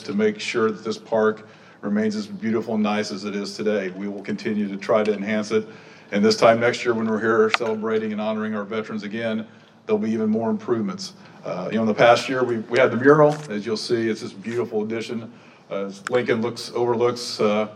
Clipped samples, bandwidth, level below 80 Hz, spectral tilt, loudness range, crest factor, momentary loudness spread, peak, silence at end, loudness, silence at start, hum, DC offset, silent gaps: under 0.1%; 11 kHz; -74 dBFS; -5.5 dB/octave; 6 LU; 22 dB; 14 LU; 0 dBFS; 0 s; -22 LUFS; 0 s; none; under 0.1%; none